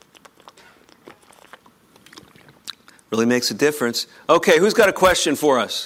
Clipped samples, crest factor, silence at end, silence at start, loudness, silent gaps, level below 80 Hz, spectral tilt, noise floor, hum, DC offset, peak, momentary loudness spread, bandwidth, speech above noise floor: under 0.1%; 20 dB; 0 s; 2.65 s; -17 LUFS; none; -52 dBFS; -3 dB/octave; -53 dBFS; none; under 0.1%; -2 dBFS; 22 LU; 16.5 kHz; 36 dB